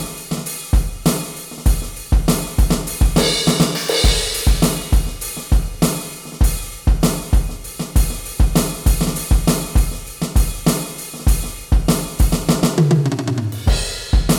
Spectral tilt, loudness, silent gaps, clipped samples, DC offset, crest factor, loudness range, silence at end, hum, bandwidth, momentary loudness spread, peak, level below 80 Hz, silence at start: -4.5 dB/octave; -19 LUFS; none; under 0.1%; under 0.1%; 14 dB; 3 LU; 0 s; none; 19.5 kHz; 9 LU; -2 dBFS; -20 dBFS; 0 s